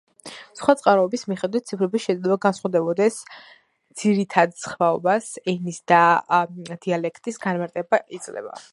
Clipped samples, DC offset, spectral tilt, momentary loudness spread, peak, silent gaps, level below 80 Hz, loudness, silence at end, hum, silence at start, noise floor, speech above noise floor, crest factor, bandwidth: under 0.1%; under 0.1%; -5.5 dB/octave; 16 LU; 0 dBFS; none; -70 dBFS; -22 LUFS; 0.1 s; none; 0.25 s; -42 dBFS; 21 dB; 22 dB; 11.5 kHz